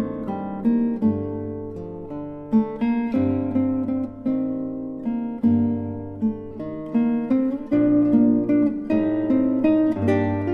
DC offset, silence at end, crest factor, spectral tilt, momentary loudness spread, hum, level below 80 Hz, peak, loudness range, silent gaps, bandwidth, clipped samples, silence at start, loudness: under 0.1%; 0 s; 14 dB; -10.5 dB/octave; 13 LU; none; -52 dBFS; -6 dBFS; 5 LU; none; 5 kHz; under 0.1%; 0 s; -22 LUFS